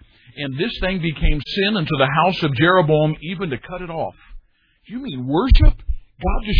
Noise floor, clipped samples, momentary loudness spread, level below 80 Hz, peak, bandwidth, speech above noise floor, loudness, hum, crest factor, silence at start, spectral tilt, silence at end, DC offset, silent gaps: -45 dBFS; under 0.1%; 14 LU; -22 dBFS; 0 dBFS; 5.2 kHz; 28 dB; -20 LUFS; none; 18 dB; 0.35 s; -8.5 dB/octave; 0 s; under 0.1%; none